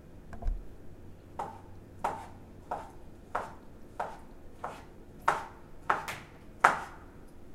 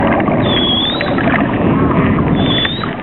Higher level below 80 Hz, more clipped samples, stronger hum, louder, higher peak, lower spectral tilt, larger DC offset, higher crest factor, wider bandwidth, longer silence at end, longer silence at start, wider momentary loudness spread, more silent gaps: second, -46 dBFS vs -32 dBFS; neither; neither; second, -35 LUFS vs -13 LUFS; about the same, 0 dBFS vs 0 dBFS; about the same, -4 dB/octave vs -4 dB/octave; second, under 0.1% vs 0.7%; first, 36 dB vs 12 dB; first, 16 kHz vs 4.3 kHz; about the same, 0 s vs 0 s; about the same, 0 s vs 0 s; first, 23 LU vs 2 LU; neither